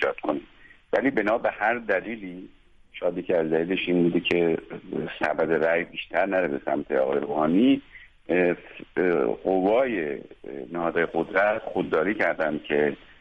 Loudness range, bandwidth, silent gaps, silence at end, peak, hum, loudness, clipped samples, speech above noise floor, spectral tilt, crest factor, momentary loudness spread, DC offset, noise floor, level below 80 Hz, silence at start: 2 LU; 6.6 kHz; none; 0.25 s; -8 dBFS; none; -25 LUFS; under 0.1%; 27 dB; -7.5 dB/octave; 18 dB; 10 LU; under 0.1%; -52 dBFS; -58 dBFS; 0 s